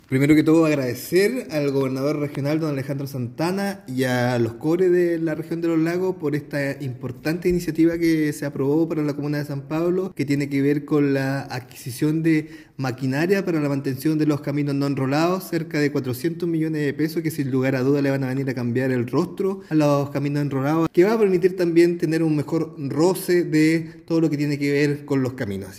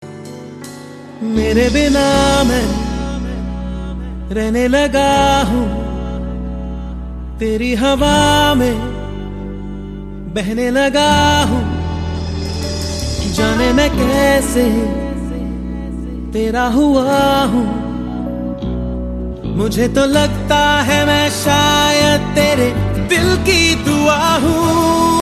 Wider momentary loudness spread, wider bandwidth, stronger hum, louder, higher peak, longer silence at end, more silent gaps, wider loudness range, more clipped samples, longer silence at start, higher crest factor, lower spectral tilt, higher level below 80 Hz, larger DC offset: second, 8 LU vs 14 LU; first, 16 kHz vs 14 kHz; neither; second, -22 LUFS vs -15 LUFS; second, -6 dBFS vs 0 dBFS; about the same, 0 s vs 0 s; neither; about the same, 3 LU vs 4 LU; neither; about the same, 0.1 s vs 0 s; about the same, 16 dB vs 14 dB; first, -7 dB/octave vs -4.5 dB/octave; second, -56 dBFS vs -26 dBFS; neither